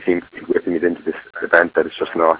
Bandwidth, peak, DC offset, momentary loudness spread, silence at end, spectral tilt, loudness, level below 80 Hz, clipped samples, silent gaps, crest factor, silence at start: 4 kHz; 0 dBFS; under 0.1%; 12 LU; 0 s; -9 dB/octave; -19 LUFS; -56 dBFS; under 0.1%; none; 18 dB; 0 s